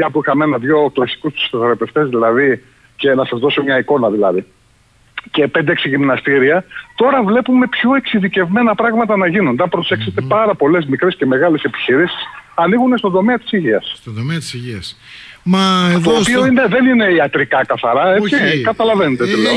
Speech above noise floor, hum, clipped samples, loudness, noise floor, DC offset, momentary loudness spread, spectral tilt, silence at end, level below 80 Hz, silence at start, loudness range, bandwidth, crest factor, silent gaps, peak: 38 dB; none; under 0.1%; -14 LUFS; -51 dBFS; under 0.1%; 9 LU; -6 dB/octave; 0 s; -52 dBFS; 0 s; 4 LU; 11 kHz; 12 dB; none; -2 dBFS